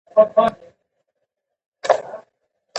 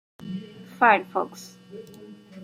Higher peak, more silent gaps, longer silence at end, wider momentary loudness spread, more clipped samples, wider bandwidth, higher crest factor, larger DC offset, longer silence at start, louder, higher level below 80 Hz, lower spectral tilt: first, 0 dBFS vs -4 dBFS; first, 1.66-1.72 s vs none; about the same, 0 s vs 0 s; second, 21 LU vs 25 LU; neither; second, 8.4 kHz vs 16 kHz; about the same, 22 dB vs 24 dB; neither; about the same, 0.15 s vs 0.2 s; first, -19 LUFS vs -22 LUFS; first, -62 dBFS vs -72 dBFS; about the same, -4 dB/octave vs -5 dB/octave